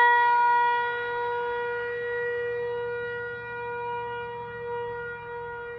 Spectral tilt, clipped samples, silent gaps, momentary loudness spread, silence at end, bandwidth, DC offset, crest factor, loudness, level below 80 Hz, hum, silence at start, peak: -5.5 dB/octave; under 0.1%; none; 15 LU; 0 s; 5.6 kHz; under 0.1%; 16 dB; -28 LUFS; -62 dBFS; none; 0 s; -10 dBFS